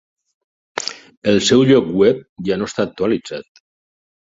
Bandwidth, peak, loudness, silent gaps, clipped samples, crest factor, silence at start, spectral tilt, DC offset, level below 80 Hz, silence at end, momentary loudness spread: 8 kHz; 0 dBFS; -17 LUFS; 1.17-1.22 s, 2.29-2.36 s; under 0.1%; 18 dB; 0.75 s; -5 dB/octave; under 0.1%; -52 dBFS; 0.9 s; 15 LU